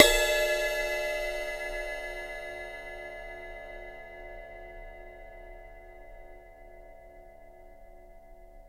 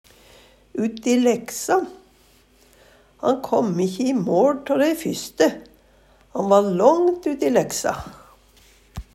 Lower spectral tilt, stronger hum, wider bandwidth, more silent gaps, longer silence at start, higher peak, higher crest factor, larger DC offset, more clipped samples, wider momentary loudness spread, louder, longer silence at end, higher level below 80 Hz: second, -1 dB/octave vs -5 dB/octave; neither; about the same, 16 kHz vs 16 kHz; neither; second, 0 s vs 0.75 s; about the same, -2 dBFS vs -2 dBFS; first, 32 dB vs 20 dB; neither; neither; first, 25 LU vs 16 LU; second, -31 LUFS vs -20 LUFS; second, 0 s vs 0.15 s; first, -46 dBFS vs -52 dBFS